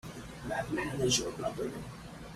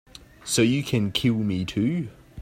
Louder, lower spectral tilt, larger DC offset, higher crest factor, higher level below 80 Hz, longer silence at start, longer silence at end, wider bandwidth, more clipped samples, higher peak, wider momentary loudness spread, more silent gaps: second, -34 LUFS vs -24 LUFS; second, -3.5 dB/octave vs -5 dB/octave; neither; about the same, 20 dB vs 18 dB; about the same, -54 dBFS vs -52 dBFS; about the same, 0.05 s vs 0.15 s; about the same, 0 s vs 0 s; about the same, 15.5 kHz vs 16.5 kHz; neither; second, -16 dBFS vs -8 dBFS; first, 16 LU vs 10 LU; neither